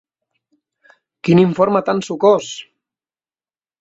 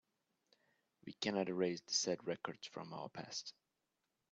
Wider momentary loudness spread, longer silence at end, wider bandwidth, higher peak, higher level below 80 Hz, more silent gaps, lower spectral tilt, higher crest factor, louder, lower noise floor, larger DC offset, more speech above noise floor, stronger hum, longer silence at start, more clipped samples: about the same, 14 LU vs 14 LU; first, 1.2 s vs 0.8 s; about the same, 8 kHz vs 8.4 kHz; first, -2 dBFS vs -22 dBFS; first, -58 dBFS vs -84 dBFS; neither; first, -6.5 dB/octave vs -3 dB/octave; about the same, 18 dB vs 22 dB; first, -15 LUFS vs -41 LUFS; about the same, under -90 dBFS vs -88 dBFS; neither; first, over 76 dB vs 46 dB; neither; first, 1.25 s vs 1.05 s; neither